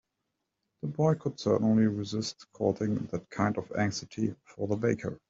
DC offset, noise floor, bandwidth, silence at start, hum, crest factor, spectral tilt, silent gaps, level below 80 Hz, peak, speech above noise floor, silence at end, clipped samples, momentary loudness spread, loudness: under 0.1%; -83 dBFS; 7.8 kHz; 0.85 s; none; 18 dB; -6.5 dB/octave; none; -64 dBFS; -12 dBFS; 54 dB; 0.15 s; under 0.1%; 11 LU; -30 LUFS